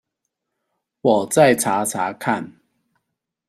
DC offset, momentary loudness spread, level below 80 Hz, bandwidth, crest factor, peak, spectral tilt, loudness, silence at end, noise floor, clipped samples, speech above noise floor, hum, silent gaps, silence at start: under 0.1%; 10 LU; -62 dBFS; 15.5 kHz; 20 dB; -2 dBFS; -4.5 dB/octave; -19 LUFS; 0.95 s; -79 dBFS; under 0.1%; 61 dB; none; none; 1.05 s